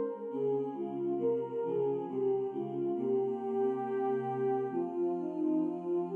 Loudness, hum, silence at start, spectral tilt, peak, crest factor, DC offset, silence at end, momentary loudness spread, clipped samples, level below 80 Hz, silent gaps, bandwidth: -34 LUFS; none; 0 s; -10 dB/octave; -22 dBFS; 12 dB; under 0.1%; 0 s; 3 LU; under 0.1%; -88 dBFS; none; 3.4 kHz